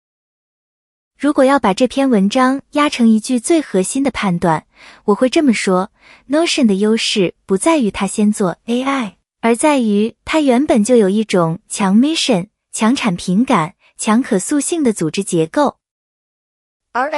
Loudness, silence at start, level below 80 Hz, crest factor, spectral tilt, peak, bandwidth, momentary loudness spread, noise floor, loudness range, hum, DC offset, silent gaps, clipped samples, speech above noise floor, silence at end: -15 LUFS; 1.2 s; -52 dBFS; 14 dB; -5 dB/octave; -2 dBFS; 12 kHz; 7 LU; under -90 dBFS; 2 LU; none; under 0.1%; 15.91-16.80 s; under 0.1%; over 76 dB; 0 s